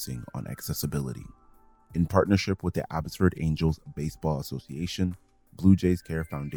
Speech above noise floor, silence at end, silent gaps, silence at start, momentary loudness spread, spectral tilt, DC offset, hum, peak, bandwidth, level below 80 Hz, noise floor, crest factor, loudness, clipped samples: 29 dB; 0 s; none; 0 s; 13 LU; -6.5 dB/octave; under 0.1%; none; -4 dBFS; over 20 kHz; -48 dBFS; -57 dBFS; 22 dB; -28 LUFS; under 0.1%